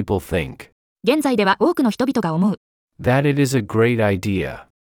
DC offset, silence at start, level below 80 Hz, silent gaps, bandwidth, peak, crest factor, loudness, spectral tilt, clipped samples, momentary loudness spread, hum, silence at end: under 0.1%; 0 s; -48 dBFS; 0.72-0.96 s, 2.57-2.88 s; 19 kHz; -4 dBFS; 14 dB; -19 LUFS; -6.5 dB/octave; under 0.1%; 8 LU; none; 0.25 s